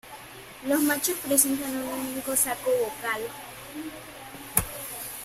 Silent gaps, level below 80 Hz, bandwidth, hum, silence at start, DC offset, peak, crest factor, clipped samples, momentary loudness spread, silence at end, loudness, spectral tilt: none; -54 dBFS; 16 kHz; none; 0.05 s; under 0.1%; 0 dBFS; 28 dB; under 0.1%; 19 LU; 0 s; -26 LUFS; -2.5 dB/octave